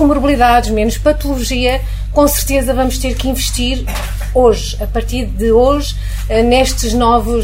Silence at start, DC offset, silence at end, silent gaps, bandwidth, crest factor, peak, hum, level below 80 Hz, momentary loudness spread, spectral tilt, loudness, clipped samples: 0 s; under 0.1%; 0 s; none; 16.5 kHz; 12 dB; 0 dBFS; none; -18 dBFS; 9 LU; -4.5 dB/octave; -14 LUFS; under 0.1%